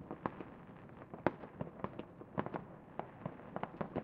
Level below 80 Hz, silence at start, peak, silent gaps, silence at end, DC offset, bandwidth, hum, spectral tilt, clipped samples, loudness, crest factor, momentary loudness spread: -68 dBFS; 0 s; -12 dBFS; none; 0 s; under 0.1%; 6.2 kHz; none; -6.5 dB/octave; under 0.1%; -46 LUFS; 34 dB; 12 LU